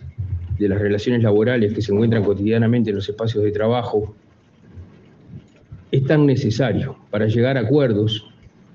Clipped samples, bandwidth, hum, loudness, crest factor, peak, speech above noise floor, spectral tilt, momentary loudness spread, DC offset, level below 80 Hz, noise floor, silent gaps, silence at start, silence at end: under 0.1%; 7.2 kHz; none; -19 LUFS; 16 dB; -4 dBFS; 32 dB; -8 dB/octave; 8 LU; under 0.1%; -50 dBFS; -50 dBFS; none; 0 s; 0.55 s